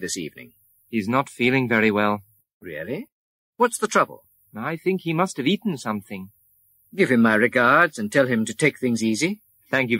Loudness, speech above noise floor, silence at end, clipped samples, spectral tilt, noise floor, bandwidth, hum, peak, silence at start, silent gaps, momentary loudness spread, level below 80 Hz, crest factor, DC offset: -22 LUFS; 39 dB; 0 s; under 0.1%; -5 dB/octave; -61 dBFS; 16 kHz; none; -4 dBFS; 0 s; 2.53-2.61 s, 3.12-3.53 s; 16 LU; -66 dBFS; 18 dB; under 0.1%